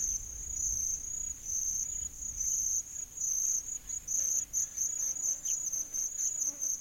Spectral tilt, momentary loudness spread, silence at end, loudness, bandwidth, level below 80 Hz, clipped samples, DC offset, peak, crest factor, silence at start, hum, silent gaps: 0 dB/octave; 7 LU; 0 s; -32 LUFS; 16.5 kHz; -54 dBFS; under 0.1%; under 0.1%; -18 dBFS; 16 dB; 0 s; none; none